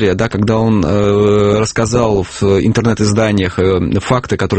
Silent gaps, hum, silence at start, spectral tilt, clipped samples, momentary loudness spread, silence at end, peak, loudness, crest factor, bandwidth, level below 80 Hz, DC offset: none; none; 0 s; -6 dB/octave; under 0.1%; 4 LU; 0 s; 0 dBFS; -13 LUFS; 12 dB; 8.8 kHz; -34 dBFS; under 0.1%